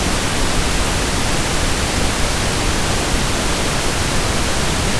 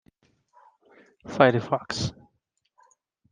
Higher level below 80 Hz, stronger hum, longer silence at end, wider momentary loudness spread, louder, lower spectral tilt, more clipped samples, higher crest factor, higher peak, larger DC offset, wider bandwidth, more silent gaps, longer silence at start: first, -22 dBFS vs -58 dBFS; neither; second, 0 s vs 1.2 s; second, 0 LU vs 17 LU; first, -18 LUFS vs -24 LUFS; second, -3 dB/octave vs -5.5 dB/octave; neither; second, 14 dB vs 26 dB; about the same, -4 dBFS vs -2 dBFS; neither; first, 11 kHz vs 9.8 kHz; neither; second, 0 s vs 1.25 s